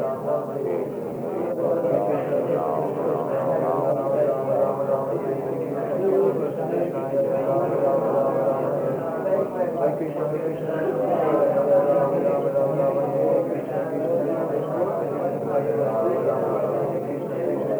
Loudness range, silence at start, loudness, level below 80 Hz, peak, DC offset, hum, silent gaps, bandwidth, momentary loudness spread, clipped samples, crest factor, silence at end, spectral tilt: 2 LU; 0 s; -23 LUFS; -72 dBFS; -8 dBFS; under 0.1%; none; none; over 20 kHz; 6 LU; under 0.1%; 14 dB; 0 s; -9 dB/octave